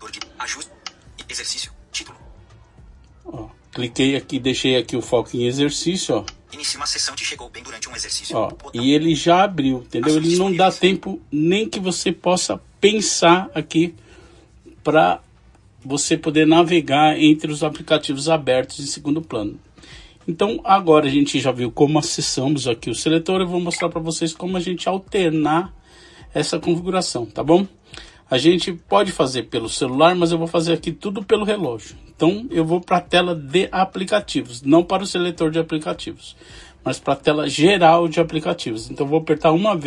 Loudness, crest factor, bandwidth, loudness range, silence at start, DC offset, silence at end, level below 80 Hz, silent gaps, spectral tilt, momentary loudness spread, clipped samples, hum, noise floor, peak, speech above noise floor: -19 LUFS; 18 dB; 11.5 kHz; 5 LU; 0 s; under 0.1%; 0 s; -50 dBFS; none; -4.5 dB/octave; 13 LU; under 0.1%; none; -50 dBFS; -2 dBFS; 32 dB